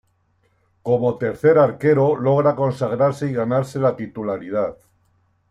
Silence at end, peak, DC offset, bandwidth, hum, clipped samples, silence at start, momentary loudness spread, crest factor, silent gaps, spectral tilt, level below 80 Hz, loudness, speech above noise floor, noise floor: 0.75 s; -4 dBFS; under 0.1%; 12 kHz; none; under 0.1%; 0.85 s; 10 LU; 16 dB; none; -8.5 dB/octave; -58 dBFS; -19 LUFS; 45 dB; -64 dBFS